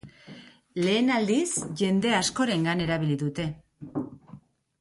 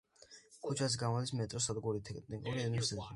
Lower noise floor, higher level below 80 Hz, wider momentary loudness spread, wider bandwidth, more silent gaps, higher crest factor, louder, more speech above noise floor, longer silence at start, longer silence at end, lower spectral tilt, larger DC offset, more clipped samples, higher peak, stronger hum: second, -51 dBFS vs -61 dBFS; first, -58 dBFS vs -64 dBFS; first, 18 LU vs 15 LU; about the same, 11.5 kHz vs 11.5 kHz; neither; about the same, 16 dB vs 18 dB; first, -26 LUFS vs -38 LUFS; about the same, 26 dB vs 24 dB; second, 0.05 s vs 0.3 s; first, 0.45 s vs 0 s; about the same, -4.5 dB/octave vs -4.5 dB/octave; neither; neither; first, -12 dBFS vs -22 dBFS; neither